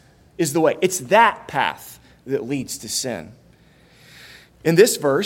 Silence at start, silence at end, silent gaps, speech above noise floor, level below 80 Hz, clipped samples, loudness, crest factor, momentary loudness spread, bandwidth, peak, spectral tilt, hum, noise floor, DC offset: 0.4 s; 0 s; none; 33 dB; -60 dBFS; under 0.1%; -19 LUFS; 20 dB; 13 LU; 17 kHz; 0 dBFS; -4 dB/octave; none; -52 dBFS; under 0.1%